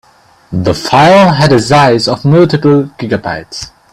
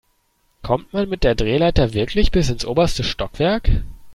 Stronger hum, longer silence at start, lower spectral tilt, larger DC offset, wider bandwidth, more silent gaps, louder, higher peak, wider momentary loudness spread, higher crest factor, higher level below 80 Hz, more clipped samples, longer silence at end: neither; second, 0.5 s vs 0.65 s; about the same, -6 dB/octave vs -6 dB/octave; neither; about the same, 13.5 kHz vs 12.5 kHz; neither; first, -9 LUFS vs -20 LUFS; about the same, 0 dBFS vs -2 dBFS; first, 15 LU vs 6 LU; second, 10 dB vs 16 dB; second, -40 dBFS vs -26 dBFS; first, 0.1% vs under 0.1%; first, 0.25 s vs 0 s